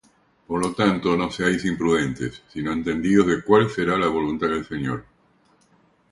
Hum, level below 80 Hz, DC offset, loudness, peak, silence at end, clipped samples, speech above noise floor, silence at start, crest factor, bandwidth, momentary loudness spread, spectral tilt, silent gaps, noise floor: none; -50 dBFS; under 0.1%; -22 LUFS; -4 dBFS; 1.1 s; under 0.1%; 39 dB; 0.5 s; 20 dB; 11.5 kHz; 11 LU; -6 dB/octave; none; -60 dBFS